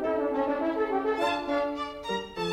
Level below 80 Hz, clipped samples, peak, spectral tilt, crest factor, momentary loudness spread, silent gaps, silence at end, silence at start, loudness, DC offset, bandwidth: -56 dBFS; under 0.1%; -14 dBFS; -5 dB/octave; 14 dB; 6 LU; none; 0 s; 0 s; -29 LUFS; under 0.1%; 15.5 kHz